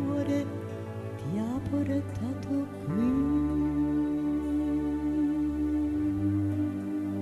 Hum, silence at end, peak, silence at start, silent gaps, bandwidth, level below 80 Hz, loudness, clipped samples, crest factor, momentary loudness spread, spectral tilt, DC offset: none; 0 s; -18 dBFS; 0 s; none; 12 kHz; -46 dBFS; -30 LUFS; under 0.1%; 12 dB; 7 LU; -8.5 dB/octave; under 0.1%